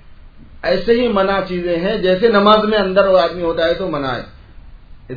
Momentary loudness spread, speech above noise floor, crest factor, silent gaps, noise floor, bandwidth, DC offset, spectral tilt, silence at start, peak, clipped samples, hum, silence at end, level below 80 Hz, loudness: 9 LU; 24 dB; 16 dB; none; -38 dBFS; 5.4 kHz; 0.2%; -7.5 dB/octave; 0.1 s; 0 dBFS; under 0.1%; none; 0 s; -38 dBFS; -15 LUFS